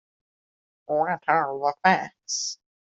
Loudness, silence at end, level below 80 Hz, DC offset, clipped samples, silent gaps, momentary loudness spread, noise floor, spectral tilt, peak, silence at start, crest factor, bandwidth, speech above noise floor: -25 LUFS; 0.4 s; -70 dBFS; under 0.1%; under 0.1%; none; 8 LU; under -90 dBFS; -3 dB/octave; -4 dBFS; 0.9 s; 24 dB; 8.2 kHz; over 66 dB